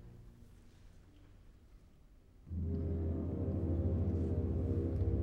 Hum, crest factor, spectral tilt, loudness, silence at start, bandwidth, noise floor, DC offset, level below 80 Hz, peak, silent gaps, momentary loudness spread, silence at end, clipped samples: none; 14 dB; -11 dB/octave; -37 LUFS; 0 s; 2.9 kHz; -61 dBFS; under 0.1%; -44 dBFS; -24 dBFS; none; 12 LU; 0 s; under 0.1%